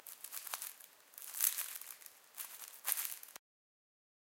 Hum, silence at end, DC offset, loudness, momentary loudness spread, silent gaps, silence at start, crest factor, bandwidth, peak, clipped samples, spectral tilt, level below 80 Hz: none; 1 s; under 0.1%; -40 LUFS; 20 LU; none; 0 s; 34 dB; 17 kHz; -12 dBFS; under 0.1%; 4 dB/octave; under -90 dBFS